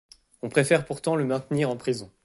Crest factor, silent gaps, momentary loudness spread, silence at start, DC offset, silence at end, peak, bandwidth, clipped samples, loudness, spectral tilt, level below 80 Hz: 20 dB; none; 8 LU; 0.45 s; under 0.1%; 0.2 s; -6 dBFS; 11.5 kHz; under 0.1%; -25 LUFS; -5.5 dB/octave; -62 dBFS